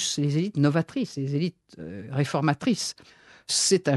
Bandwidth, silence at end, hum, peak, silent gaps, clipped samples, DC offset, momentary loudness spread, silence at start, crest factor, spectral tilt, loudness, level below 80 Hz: 12 kHz; 0 s; none; -6 dBFS; none; under 0.1%; under 0.1%; 17 LU; 0 s; 18 dB; -4.5 dB/octave; -26 LUFS; -68 dBFS